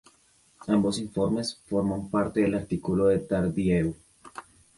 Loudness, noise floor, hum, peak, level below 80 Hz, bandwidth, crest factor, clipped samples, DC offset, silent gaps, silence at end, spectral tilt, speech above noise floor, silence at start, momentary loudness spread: -27 LUFS; -62 dBFS; none; -12 dBFS; -50 dBFS; 11.5 kHz; 16 dB; under 0.1%; under 0.1%; none; 0.35 s; -6.5 dB/octave; 37 dB; 0.6 s; 21 LU